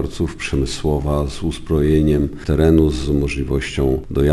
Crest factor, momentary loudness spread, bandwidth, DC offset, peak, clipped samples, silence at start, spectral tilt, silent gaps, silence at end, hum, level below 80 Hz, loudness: 16 dB; 7 LU; 12 kHz; under 0.1%; 0 dBFS; under 0.1%; 0 s; -7 dB/octave; none; 0 s; none; -26 dBFS; -18 LUFS